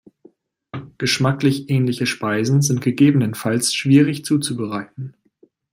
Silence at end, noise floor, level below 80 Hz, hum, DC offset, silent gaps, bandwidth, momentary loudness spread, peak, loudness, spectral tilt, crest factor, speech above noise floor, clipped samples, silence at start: 0.6 s; -57 dBFS; -58 dBFS; none; under 0.1%; none; 16 kHz; 19 LU; -2 dBFS; -18 LUFS; -5 dB/octave; 16 dB; 39 dB; under 0.1%; 0.75 s